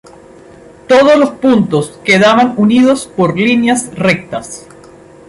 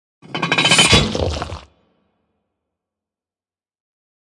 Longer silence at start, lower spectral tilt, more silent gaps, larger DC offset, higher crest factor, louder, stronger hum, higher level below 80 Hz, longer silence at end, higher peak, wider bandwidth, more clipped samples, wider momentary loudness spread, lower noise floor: first, 0.9 s vs 0.3 s; first, -5 dB/octave vs -2.5 dB/octave; neither; neither; second, 12 dB vs 22 dB; first, -10 LUFS vs -14 LUFS; neither; second, -48 dBFS vs -38 dBFS; second, 0.7 s vs 2.8 s; about the same, 0 dBFS vs 0 dBFS; about the same, 11.5 kHz vs 11.5 kHz; neither; second, 10 LU vs 20 LU; second, -37 dBFS vs under -90 dBFS